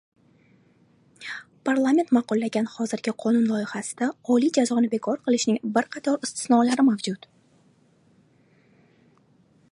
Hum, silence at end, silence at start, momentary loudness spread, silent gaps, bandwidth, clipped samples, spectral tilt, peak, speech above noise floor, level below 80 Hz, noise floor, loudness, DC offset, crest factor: none; 2.55 s; 1.2 s; 11 LU; none; 11.5 kHz; under 0.1%; -4.5 dB/octave; -6 dBFS; 38 dB; -74 dBFS; -60 dBFS; -24 LUFS; under 0.1%; 18 dB